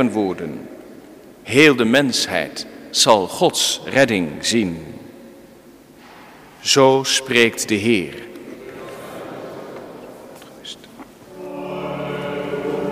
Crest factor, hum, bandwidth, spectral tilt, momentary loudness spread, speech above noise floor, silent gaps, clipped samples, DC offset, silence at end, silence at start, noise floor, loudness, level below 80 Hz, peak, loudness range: 20 dB; none; 16 kHz; -3 dB/octave; 23 LU; 28 dB; none; under 0.1%; under 0.1%; 0 s; 0 s; -45 dBFS; -17 LUFS; -56 dBFS; 0 dBFS; 17 LU